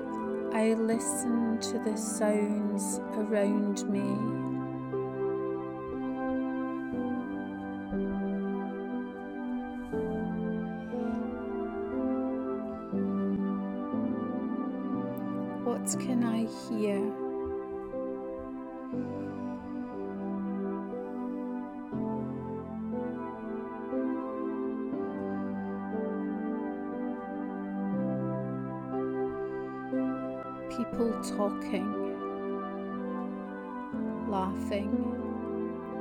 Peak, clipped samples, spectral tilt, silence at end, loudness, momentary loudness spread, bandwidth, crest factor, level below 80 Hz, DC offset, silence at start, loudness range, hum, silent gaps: -16 dBFS; under 0.1%; -6 dB/octave; 0 s; -34 LUFS; 8 LU; 17 kHz; 16 dB; -60 dBFS; under 0.1%; 0 s; 6 LU; none; none